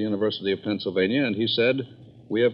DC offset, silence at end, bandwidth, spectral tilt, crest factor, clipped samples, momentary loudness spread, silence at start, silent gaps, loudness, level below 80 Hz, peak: under 0.1%; 0 s; 5.6 kHz; -8.5 dB/octave; 16 dB; under 0.1%; 8 LU; 0 s; none; -24 LUFS; -70 dBFS; -8 dBFS